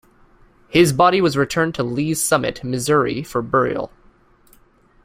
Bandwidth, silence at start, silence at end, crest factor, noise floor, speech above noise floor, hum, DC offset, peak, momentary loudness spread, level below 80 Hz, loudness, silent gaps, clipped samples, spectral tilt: 16 kHz; 0.7 s; 1.2 s; 18 dB; -54 dBFS; 36 dB; none; under 0.1%; -2 dBFS; 10 LU; -50 dBFS; -18 LUFS; none; under 0.1%; -4.5 dB/octave